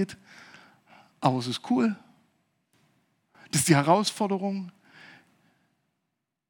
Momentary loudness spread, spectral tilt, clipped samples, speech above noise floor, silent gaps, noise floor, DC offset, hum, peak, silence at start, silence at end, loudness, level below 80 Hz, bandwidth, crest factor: 17 LU; -4.5 dB/octave; under 0.1%; 57 dB; none; -82 dBFS; under 0.1%; none; -6 dBFS; 0 s; 1.8 s; -26 LUFS; -74 dBFS; 18 kHz; 24 dB